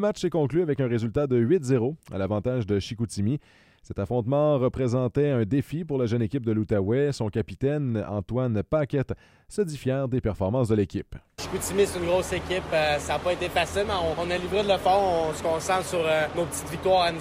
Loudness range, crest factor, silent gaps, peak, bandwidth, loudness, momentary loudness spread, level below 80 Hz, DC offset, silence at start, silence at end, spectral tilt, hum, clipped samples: 3 LU; 16 dB; none; -10 dBFS; 16 kHz; -26 LUFS; 7 LU; -48 dBFS; under 0.1%; 0 s; 0 s; -6 dB/octave; none; under 0.1%